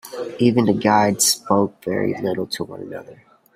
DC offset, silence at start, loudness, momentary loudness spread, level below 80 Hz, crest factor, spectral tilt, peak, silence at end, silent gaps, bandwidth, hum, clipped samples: under 0.1%; 0.05 s; -19 LUFS; 15 LU; -60 dBFS; 18 dB; -4 dB/octave; -2 dBFS; 0.4 s; none; 16 kHz; none; under 0.1%